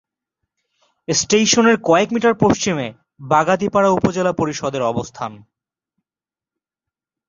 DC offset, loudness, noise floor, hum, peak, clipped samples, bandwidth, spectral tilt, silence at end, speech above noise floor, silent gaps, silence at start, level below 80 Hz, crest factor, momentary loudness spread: under 0.1%; -17 LUFS; under -90 dBFS; none; 0 dBFS; under 0.1%; 7.6 kHz; -4 dB/octave; 1.9 s; over 73 dB; none; 1.1 s; -52 dBFS; 18 dB; 14 LU